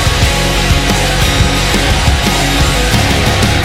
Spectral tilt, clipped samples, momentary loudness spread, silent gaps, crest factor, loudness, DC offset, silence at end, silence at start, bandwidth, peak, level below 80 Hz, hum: -4 dB/octave; under 0.1%; 1 LU; none; 10 dB; -11 LUFS; under 0.1%; 0 s; 0 s; 16.5 kHz; 0 dBFS; -16 dBFS; none